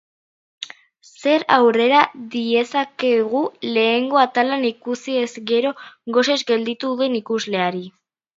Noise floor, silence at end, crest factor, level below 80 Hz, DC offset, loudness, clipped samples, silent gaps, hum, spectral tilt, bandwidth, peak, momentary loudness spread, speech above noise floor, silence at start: -50 dBFS; 0.5 s; 20 dB; -74 dBFS; under 0.1%; -19 LUFS; under 0.1%; none; none; -4 dB/octave; 7.8 kHz; 0 dBFS; 12 LU; 31 dB; 0.6 s